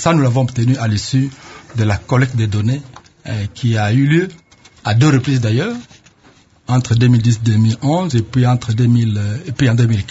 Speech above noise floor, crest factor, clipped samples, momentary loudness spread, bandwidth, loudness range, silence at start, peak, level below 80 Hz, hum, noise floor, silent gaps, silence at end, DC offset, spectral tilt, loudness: 35 dB; 14 dB; under 0.1%; 11 LU; 8 kHz; 3 LU; 0 s; 0 dBFS; -40 dBFS; none; -49 dBFS; none; 0 s; under 0.1%; -6.5 dB/octave; -15 LUFS